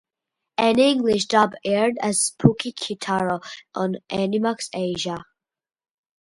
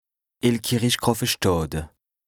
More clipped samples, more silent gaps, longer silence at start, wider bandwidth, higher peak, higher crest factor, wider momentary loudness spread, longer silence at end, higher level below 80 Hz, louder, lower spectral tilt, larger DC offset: neither; neither; first, 0.6 s vs 0.45 s; second, 11.5 kHz vs over 20 kHz; first, 0 dBFS vs -4 dBFS; about the same, 22 dB vs 20 dB; about the same, 11 LU vs 10 LU; first, 1.1 s vs 0.4 s; second, -58 dBFS vs -44 dBFS; about the same, -22 LUFS vs -23 LUFS; about the same, -4.5 dB/octave vs -4.5 dB/octave; neither